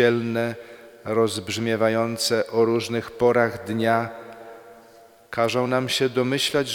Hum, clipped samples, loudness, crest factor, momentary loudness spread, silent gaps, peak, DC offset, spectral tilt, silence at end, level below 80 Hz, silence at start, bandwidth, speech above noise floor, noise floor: none; under 0.1%; -23 LUFS; 18 dB; 17 LU; none; -6 dBFS; under 0.1%; -4.5 dB/octave; 0 s; -62 dBFS; 0 s; 19 kHz; 28 dB; -51 dBFS